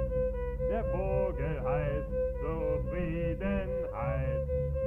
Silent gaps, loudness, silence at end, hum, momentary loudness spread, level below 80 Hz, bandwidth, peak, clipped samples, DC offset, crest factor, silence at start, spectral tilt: none; -33 LUFS; 0 s; none; 3 LU; -36 dBFS; 3.5 kHz; -18 dBFS; under 0.1%; under 0.1%; 12 dB; 0 s; -10 dB/octave